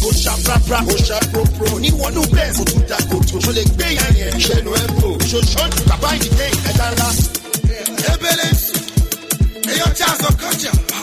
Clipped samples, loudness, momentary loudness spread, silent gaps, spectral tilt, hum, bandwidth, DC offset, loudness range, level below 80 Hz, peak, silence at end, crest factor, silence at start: under 0.1%; -15 LUFS; 3 LU; none; -4 dB/octave; none; 16 kHz; under 0.1%; 1 LU; -20 dBFS; 0 dBFS; 0 s; 16 dB; 0 s